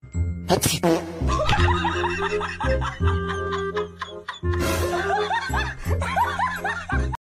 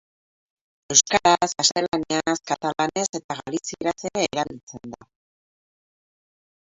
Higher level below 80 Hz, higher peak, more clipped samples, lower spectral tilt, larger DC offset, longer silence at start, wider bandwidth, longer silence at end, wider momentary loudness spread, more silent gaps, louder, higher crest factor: first, -32 dBFS vs -60 dBFS; about the same, -4 dBFS vs -2 dBFS; neither; first, -5 dB/octave vs -2 dB/octave; neither; second, 0.05 s vs 0.9 s; first, 15.5 kHz vs 8.2 kHz; second, 0.1 s vs 1.7 s; second, 8 LU vs 13 LU; second, none vs 1.88-1.92 s, 3.09-3.13 s, 3.24-3.29 s, 4.63-4.67 s; about the same, -24 LUFS vs -22 LUFS; about the same, 20 dB vs 24 dB